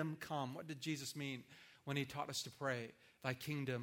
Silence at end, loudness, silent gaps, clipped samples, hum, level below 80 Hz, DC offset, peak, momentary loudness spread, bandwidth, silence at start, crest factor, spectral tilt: 0 s; -45 LUFS; none; under 0.1%; none; -80 dBFS; under 0.1%; -22 dBFS; 7 LU; 17 kHz; 0 s; 22 dB; -4.5 dB/octave